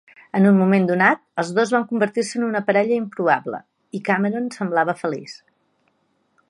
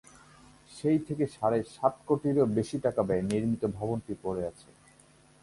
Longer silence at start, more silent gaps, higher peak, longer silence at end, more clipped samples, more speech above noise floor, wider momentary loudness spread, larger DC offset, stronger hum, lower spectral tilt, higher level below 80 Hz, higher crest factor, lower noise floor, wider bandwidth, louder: second, 0.35 s vs 0.7 s; neither; first, -2 dBFS vs -10 dBFS; first, 1.15 s vs 0.9 s; neither; first, 47 dB vs 31 dB; first, 12 LU vs 8 LU; neither; neither; about the same, -6.5 dB/octave vs -7.5 dB/octave; second, -72 dBFS vs -58 dBFS; about the same, 20 dB vs 20 dB; first, -67 dBFS vs -60 dBFS; about the same, 11 kHz vs 11.5 kHz; first, -20 LUFS vs -30 LUFS